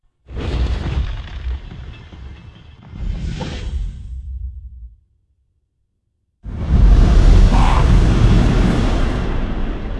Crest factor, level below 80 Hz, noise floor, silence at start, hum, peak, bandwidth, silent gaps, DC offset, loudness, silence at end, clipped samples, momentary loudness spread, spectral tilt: 16 dB; -18 dBFS; -68 dBFS; 0.3 s; none; 0 dBFS; 8.8 kHz; none; under 0.1%; -18 LUFS; 0 s; under 0.1%; 24 LU; -7 dB/octave